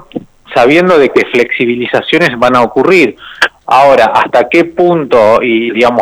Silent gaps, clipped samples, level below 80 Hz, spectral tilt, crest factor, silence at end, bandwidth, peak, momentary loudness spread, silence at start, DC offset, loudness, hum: none; 0.3%; -44 dBFS; -5.5 dB/octave; 8 dB; 0 s; 15 kHz; 0 dBFS; 7 LU; 0.15 s; under 0.1%; -8 LUFS; none